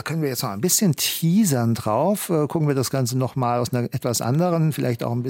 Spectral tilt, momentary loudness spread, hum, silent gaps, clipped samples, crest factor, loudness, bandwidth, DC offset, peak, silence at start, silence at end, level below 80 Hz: -5 dB/octave; 5 LU; none; none; under 0.1%; 14 dB; -21 LUFS; 17 kHz; under 0.1%; -6 dBFS; 0.05 s; 0 s; -62 dBFS